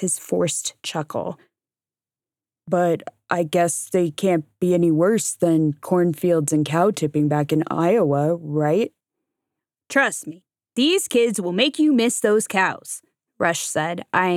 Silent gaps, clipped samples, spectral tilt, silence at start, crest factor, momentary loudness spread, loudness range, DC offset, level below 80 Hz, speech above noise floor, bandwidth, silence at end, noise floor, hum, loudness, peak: none; under 0.1%; -4.5 dB/octave; 0 s; 18 dB; 10 LU; 5 LU; under 0.1%; -72 dBFS; over 70 dB; 16.5 kHz; 0 s; under -90 dBFS; none; -21 LUFS; -4 dBFS